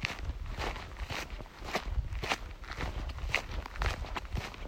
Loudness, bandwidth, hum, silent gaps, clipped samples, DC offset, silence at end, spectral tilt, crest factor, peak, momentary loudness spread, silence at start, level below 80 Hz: -38 LUFS; 16 kHz; none; none; under 0.1%; under 0.1%; 0 s; -4 dB/octave; 26 dB; -10 dBFS; 8 LU; 0 s; -40 dBFS